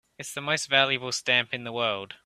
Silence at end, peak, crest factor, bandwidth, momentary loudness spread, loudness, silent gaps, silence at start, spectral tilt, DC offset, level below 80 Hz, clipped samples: 0.1 s; -6 dBFS; 22 dB; 15.5 kHz; 10 LU; -25 LUFS; none; 0.2 s; -2 dB/octave; under 0.1%; -72 dBFS; under 0.1%